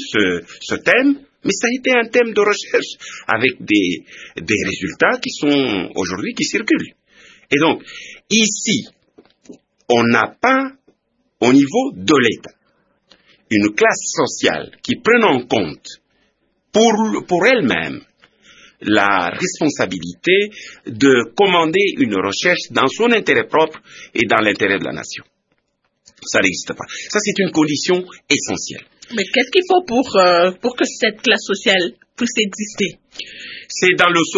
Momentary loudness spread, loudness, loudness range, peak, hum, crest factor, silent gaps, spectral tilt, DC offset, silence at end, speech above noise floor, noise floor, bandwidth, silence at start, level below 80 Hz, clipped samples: 13 LU; -16 LUFS; 3 LU; 0 dBFS; none; 18 dB; none; -3.5 dB/octave; under 0.1%; 0 s; 52 dB; -68 dBFS; 7.8 kHz; 0 s; -58 dBFS; under 0.1%